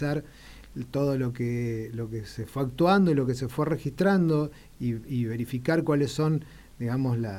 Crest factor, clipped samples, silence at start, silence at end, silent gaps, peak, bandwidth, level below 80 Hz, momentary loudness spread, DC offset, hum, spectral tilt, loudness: 16 dB; under 0.1%; 0 s; 0 s; none; -10 dBFS; 16.5 kHz; -52 dBFS; 12 LU; under 0.1%; none; -7.5 dB/octave; -27 LUFS